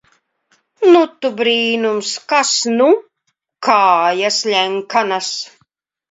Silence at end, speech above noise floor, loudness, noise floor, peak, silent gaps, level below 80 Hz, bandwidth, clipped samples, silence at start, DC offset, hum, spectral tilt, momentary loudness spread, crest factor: 0.65 s; 56 dB; -15 LUFS; -70 dBFS; 0 dBFS; none; -72 dBFS; 8 kHz; under 0.1%; 0.8 s; under 0.1%; none; -2 dB/octave; 9 LU; 16 dB